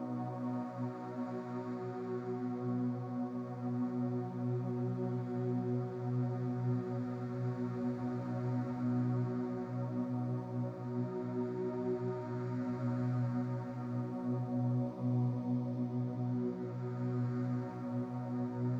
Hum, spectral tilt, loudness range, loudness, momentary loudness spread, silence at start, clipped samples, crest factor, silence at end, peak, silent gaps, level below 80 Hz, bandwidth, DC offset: none; -10.5 dB/octave; 2 LU; -38 LUFS; 5 LU; 0 s; under 0.1%; 12 dB; 0 s; -24 dBFS; none; -74 dBFS; 6 kHz; under 0.1%